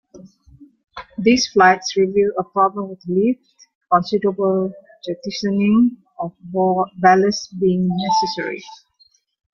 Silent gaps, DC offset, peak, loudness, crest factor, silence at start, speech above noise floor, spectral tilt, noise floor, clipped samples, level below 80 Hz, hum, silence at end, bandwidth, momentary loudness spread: 3.75-3.81 s; under 0.1%; 0 dBFS; -18 LUFS; 18 dB; 0.15 s; 41 dB; -5.5 dB/octave; -58 dBFS; under 0.1%; -58 dBFS; none; 0.8 s; 7.2 kHz; 16 LU